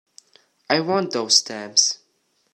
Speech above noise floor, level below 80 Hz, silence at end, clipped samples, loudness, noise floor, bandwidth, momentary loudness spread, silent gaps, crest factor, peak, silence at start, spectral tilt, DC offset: 47 dB; -74 dBFS; 0.6 s; under 0.1%; -19 LUFS; -67 dBFS; 14 kHz; 6 LU; none; 24 dB; 0 dBFS; 0.7 s; -1.5 dB/octave; under 0.1%